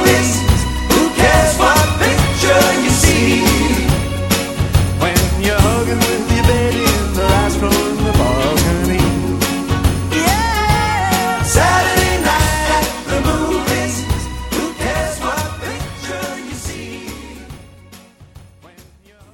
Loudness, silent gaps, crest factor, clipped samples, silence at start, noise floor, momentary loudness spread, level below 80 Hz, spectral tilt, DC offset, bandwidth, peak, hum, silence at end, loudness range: -15 LUFS; none; 14 dB; under 0.1%; 0 s; -45 dBFS; 12 LU; -24 dBFS; -4.5 dB/octave; under 0.1%; 18 kHz; 0 dBFS; none; 0.5 s; 11 LU